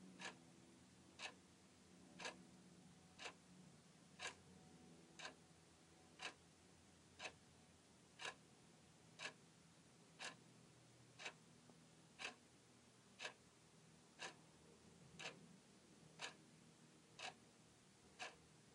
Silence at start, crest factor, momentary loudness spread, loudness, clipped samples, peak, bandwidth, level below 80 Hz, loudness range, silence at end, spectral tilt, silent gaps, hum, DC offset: 0 s; 26 dB; 15 LU; -59 LUFS; under 0.1%; -36 dBFS; 11.5 kHz; -88 dBFS; 1 LU; 0 s; -2 dB/octave; none; none; under 0.1%